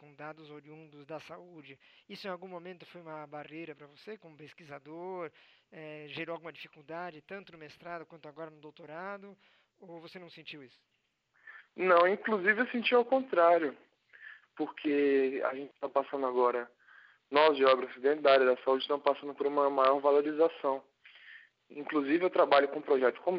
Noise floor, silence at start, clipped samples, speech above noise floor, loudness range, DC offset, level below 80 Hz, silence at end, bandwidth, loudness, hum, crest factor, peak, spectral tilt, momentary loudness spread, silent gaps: -76 dBFS; 0.2 s; under 0.1%; 45 dB; 18 LU; under 0.1%; -86 dBFS; 0 s; 6 kHz; -29 LUFS; none; 22 dB; -10 dBFS; -6.5 dB/octave; 24 LU; none